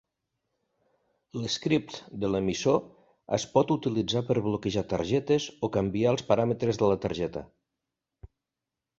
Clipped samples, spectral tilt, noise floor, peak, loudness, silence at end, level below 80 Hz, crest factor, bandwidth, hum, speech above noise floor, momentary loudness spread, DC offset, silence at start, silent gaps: under 0.1%; -6 dB/octave; -88 dBFS; -8 dBFS; -28 LUFS; 0.75 s; -56 dBFS; 22 dB; 8 kHz; none; 61 dB; 8 LU; under 0.1%; 1.35 s; none